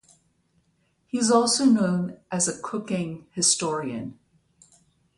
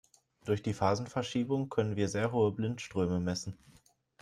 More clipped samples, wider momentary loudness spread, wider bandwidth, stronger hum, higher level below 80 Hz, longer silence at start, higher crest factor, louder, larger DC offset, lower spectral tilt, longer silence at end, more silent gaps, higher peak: neither; first, 14 LU vs 6 LU; about the same, 11.5 kHz vs 12.5 kHz; neither; about the same, -66 dBFS vs -64 dBFS; first, 1.15 s vs 0.45 s; about the same, 20 dB vs 18 dB; first, -23 LUFS vs -33 LUFS; neither; second, -3.5 dB/octave vs -6 dB/octave; first, 1.05 s vs 0.7 s; neither; first, -6 dBFS vs -14 dBFS